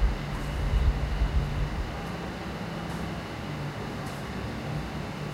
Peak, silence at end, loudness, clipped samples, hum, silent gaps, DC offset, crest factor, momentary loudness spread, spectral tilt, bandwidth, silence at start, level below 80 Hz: -12 dBFS; 0 s; -32 LUFS; under 0.1%; none; none; under 0.1%; 18 dB; 7 LU; -6.5 dB/octave; 15 kHz; 0 s; -32 dBFS